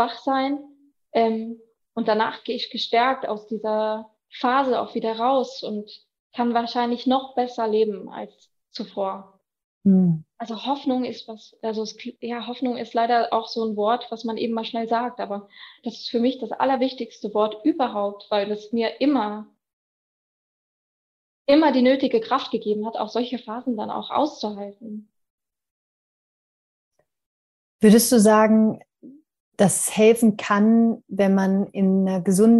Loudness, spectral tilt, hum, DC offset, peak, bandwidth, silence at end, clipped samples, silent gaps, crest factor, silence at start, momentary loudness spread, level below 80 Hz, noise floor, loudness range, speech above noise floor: -22 LUFS; -5 dB/octave; none; under 0.1%; -2 dBFS; 13 kHz; 0 s; under 0.1%; 6.19-6.30 s, 9.64-9.81 s, 19.73-21.45 s, 25.30-25.38 s, 25.71-26.91 s, 27.26-27.79 s, 29.40-29.52 s; 20 dB; 0 s; 16 LU; -70 dBFS; -48 dBFS; 8 LU; 26 dB